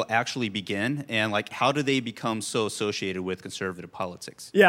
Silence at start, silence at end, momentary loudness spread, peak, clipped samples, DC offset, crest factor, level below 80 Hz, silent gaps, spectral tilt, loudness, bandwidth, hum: 0 s; 0 s; 9 LU; -4 dBFS; under 0.1%; under 0.1%; 22 dB; -72 dBFS; none; -4 dB/octave; -28 LUFS; 16.5 kHz; none